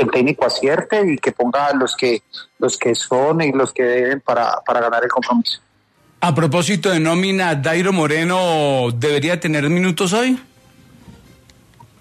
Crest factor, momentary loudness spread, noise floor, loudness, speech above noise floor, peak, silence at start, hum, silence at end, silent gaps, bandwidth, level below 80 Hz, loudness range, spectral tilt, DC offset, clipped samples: 14 dB; 3 LU; -56 dBFS; -17 LUFS; 39 dB; -4 dBFS; 0 s; none; 0.9 s; none; 13.5 kHz; -58 dBFS; 1 LU; -5 dB/octave; under 0.1%; under 0.1%